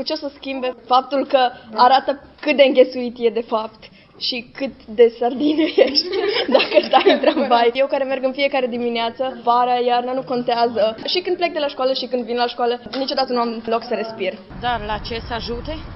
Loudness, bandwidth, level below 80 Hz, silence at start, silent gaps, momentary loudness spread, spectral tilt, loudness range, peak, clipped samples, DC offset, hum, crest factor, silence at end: -19 LUFS; 5.8 kHz; -46 dBFS; 0 s; none; 11 LU; -7.5 dB/octave; 5 LU; 0 dBFS; under 0.1%; under 0.1%; none; 18 dB; 0 s